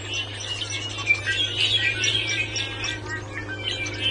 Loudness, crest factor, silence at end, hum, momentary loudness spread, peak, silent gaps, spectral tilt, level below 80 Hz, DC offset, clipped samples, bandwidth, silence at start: -24 LUFS; 18 dB; 0 s; none; 10 LU; -8 dBFS; none; -2 dB/octave; -48 dBFS; under 0.1%; under 0.1%; 11.5 kHz; 0 s